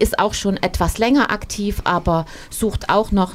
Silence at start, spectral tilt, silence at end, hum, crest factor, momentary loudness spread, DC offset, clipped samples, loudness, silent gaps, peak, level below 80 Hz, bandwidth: 0 s; -5 dB/octave; 0 s; none; 16 dB; 7 LU; under 0.1%; under 0.1%; -19 LUFS; none; -2 dBFS; -30 dBFS; 16 kHz